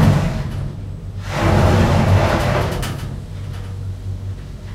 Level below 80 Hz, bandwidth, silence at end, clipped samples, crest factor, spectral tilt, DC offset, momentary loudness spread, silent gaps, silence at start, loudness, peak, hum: -28 dBFS; 15 kHz; 0 s; under 0.1%; 16 dB; -6.5 dB/octave; under 0.1%; 15 LU; none; 0 s; -19 LUFS; -2 dBFS; none